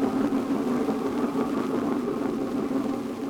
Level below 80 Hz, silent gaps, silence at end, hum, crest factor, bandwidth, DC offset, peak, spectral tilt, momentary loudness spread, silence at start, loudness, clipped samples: -58 dBFS; none; 0 s; none; 12 dB; 17.5 kHz; under 0.1%; -14 dBFS; -6.5 dB/octave; 3 LU; 0 s; -27 LUFS; under 0.1%